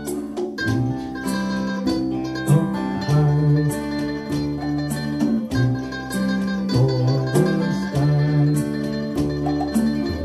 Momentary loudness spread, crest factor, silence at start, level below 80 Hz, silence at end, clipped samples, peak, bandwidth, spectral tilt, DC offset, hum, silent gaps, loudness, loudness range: 7 LU; 16 dB; 0 s; -42 dBFS; 0 s; under 0.1%; -4 dBFS; 13.5 kHz; -7 dB/octave; under 0.1%; none; none; -21 LUFS; 2 LU